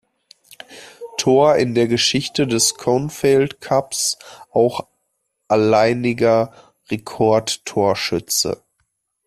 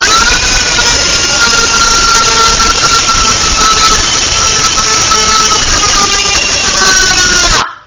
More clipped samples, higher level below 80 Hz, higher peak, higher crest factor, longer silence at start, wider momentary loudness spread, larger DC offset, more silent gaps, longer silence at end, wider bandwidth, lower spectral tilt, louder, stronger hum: second, under 0.1% vs 0.2%; second, -54 dBFS vs -22 dBFS; about the same, -2 dBFS vs 0 dBFS; first, 16 dB vs 8 dB; first, 0.7 s vs 0 s; first, 13 LU vs 2 LU; neither; neither; first, 0.7 s vs 0.1 s; first, 15 kHz vs 8 kHz; first, -4 dB/octave vs -0.5 dB/octave; second, -18 LUFS vs -6 LUFS; neither